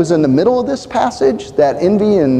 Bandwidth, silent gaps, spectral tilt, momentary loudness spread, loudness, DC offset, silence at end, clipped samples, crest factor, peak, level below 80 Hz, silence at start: 9.8 kHz; none; -7 dB/octave; 5 LU; -14 LUFS; under 0.1%; 0 s; under 0.1%; 12 dB; -2 dBFS; -44 dBFS; 0 s